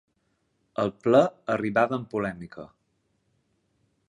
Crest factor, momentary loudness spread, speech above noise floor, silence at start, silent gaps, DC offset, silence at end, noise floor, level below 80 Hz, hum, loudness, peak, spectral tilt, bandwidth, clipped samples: 22 dB; 19 LU; 48 dB; 0.8 s; none; under 0.1%; 1.45 s; -73 dBFS; -64 dBFS; none; -25 LUFS; -6 dBFS; -7 dB/octave; 11 kHz; under 0.1%